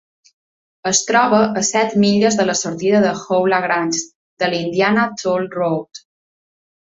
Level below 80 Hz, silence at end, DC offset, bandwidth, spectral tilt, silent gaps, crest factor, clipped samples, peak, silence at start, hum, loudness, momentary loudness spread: -58 dBFS; 0.95 s; under 0.1%; 8 kHz; -3.5 dB/octave; 4.15-4.37 s; 16 dB; under 0.1%; -2 dBFS; 0.85 s; none; -17 LUFS; 8 LU